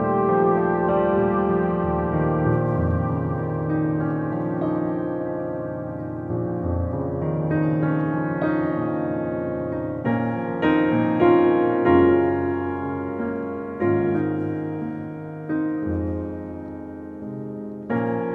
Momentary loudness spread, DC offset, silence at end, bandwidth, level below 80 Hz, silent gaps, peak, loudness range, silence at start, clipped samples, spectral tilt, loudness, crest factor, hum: 12 LU; under 0.1%; 0 s; 4.2 kHz; -44 dBFS; none; -6 dBFS; 6 LU; 0 s; under 0.1%; -11 dB/octave; -23 LUFS; 16 dB; none